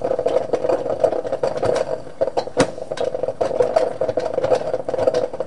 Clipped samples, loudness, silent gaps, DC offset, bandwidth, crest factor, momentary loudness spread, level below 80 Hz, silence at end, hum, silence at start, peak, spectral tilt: under 0.1%; -21 LUFS; none; 2%; 11 kHz; 20 dB; 5 LU; -50 dBFS; 0 s; none; 0 s; -2 dBFS; -5 dB/octave